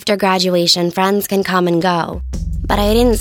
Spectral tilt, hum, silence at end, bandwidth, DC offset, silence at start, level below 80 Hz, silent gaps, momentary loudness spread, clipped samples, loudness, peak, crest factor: -4.5 dB/octave; none; 0 s; 19.5 kHz; under 0.1%; 0 s; -26 dBFS; none; 11 LU; under 0.1%; -15 LUFS; 0 dBFS; 14 dB